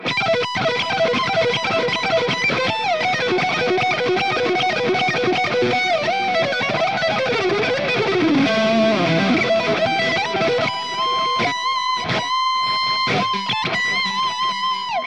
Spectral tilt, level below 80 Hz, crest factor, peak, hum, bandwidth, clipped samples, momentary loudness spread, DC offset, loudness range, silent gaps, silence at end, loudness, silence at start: -4 dB/octave; -58 dBFS; 14 dB; -6 dBFS; none; 10.5 kHz; under 0.1%; 3 LU; 0.3%; 2 LU; none; 0 s; -18 LUFS; 0 s